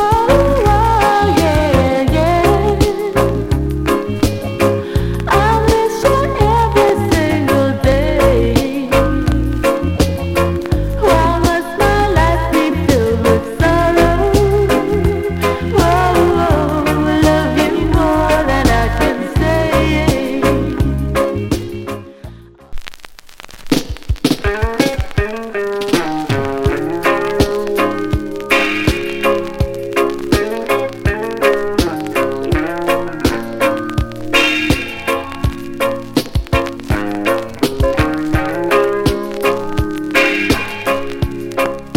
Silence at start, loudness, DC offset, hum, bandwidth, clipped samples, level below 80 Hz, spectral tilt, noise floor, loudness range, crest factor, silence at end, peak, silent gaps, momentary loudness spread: 0 s; -15 LUFS; under 0.1%; none; 17 kHz; under 0.1%; -24 dBFS; -6 dB/octave; -35 dBFS; 5 LU; 14 dB; 0 s; 0 dBFS; none; 7 LU